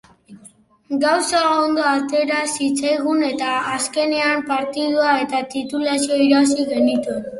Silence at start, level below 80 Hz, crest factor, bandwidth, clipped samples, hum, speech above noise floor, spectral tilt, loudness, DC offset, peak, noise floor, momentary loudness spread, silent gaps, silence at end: 0.3 s; -62 dBFS; 16 dB; 11.5 kHz; under 0.1%; none; 31 dB; -2.5 dB/octave; -18 LUFS; under 0.1%; -4 dBFS; -49 dBFS; 6 LU; none; 0 s